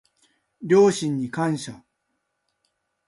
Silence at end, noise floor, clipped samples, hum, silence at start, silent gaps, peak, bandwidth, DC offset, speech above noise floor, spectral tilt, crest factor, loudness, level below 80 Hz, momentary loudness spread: 1.3 s; -76 dBFS; under 0.1%; none; 0.6 s; none; -8 dBFS; 11.5 kHz; under 0.1%; 55 dB; -6 dB/octave; 18 dB; -21 LUFS; -66 dBFS; 18 LU